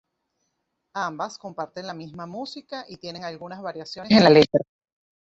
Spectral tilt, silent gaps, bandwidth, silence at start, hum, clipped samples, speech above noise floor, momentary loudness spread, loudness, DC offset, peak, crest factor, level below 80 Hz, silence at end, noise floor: -6 dB/octave; none; 7.8 kHz; 0.95 s; none; under 0.1%; 54 dB; 21 LU; -20 LUFS; under 0.1%; -2 dBFS; 22 dB; -60 dBFS; 0.7 s; -77 dBFS